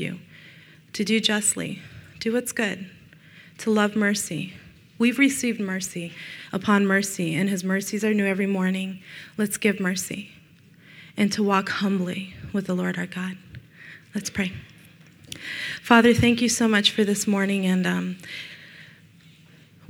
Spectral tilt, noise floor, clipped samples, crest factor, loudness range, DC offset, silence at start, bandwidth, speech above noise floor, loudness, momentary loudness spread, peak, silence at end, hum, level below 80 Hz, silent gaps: -4 dB/octave; -52 dBFS; under 0.1%; 24 dB; 6 LU; under 0.1%; 0 s; 17 kHz; 29 dB; -23 LUFS; 18 LU; 0 dBFS; 1.05 s; none; -58 dBFS; none